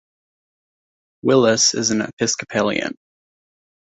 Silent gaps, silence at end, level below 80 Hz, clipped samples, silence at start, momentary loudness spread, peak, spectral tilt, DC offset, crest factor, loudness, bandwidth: 2.13-2.17 s; 0.95 s; -60 dBFS; under 0.1%; 1.25 s; 10 LU; -2 dBFS; -3 dB/octave; under 0.1%; 18 dB; -18 LUFS; 8.4 kHz